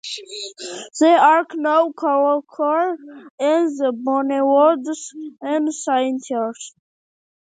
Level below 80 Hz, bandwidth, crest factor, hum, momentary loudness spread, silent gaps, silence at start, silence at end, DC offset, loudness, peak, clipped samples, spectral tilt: -80 dBFS; 9.4 kHz; 18 dB; none; 16 LU; 3.30-3.38 s; 0.05 s; 0.85 s; under 0.1%; -18 LUFS; -2 dBFS; under 0.1%; -2.5 dB/octave